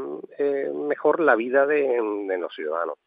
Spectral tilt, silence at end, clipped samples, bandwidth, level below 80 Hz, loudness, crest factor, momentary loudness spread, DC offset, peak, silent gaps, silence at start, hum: -8.5 dB/octave; 0.1 s; under 0.1%; 4.7 kHz; under -90 dBFS; -23 LUFS; 20 dB; 9 LU; under 0.1%; -4 dBFS; none; 0 s; none